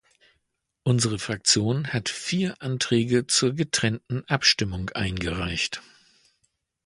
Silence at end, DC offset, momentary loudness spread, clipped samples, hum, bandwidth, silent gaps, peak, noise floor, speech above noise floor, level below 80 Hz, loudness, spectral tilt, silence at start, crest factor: 1.05 s; under 0.1%; 8 LU; under 0.1%; none; 11.5 kHz; none; -4 dBFS; -76 dBFS; 51 dB; -48 dBFS; -24 LUFS; -3.5 dB/octave; 0.85 s; 22 dB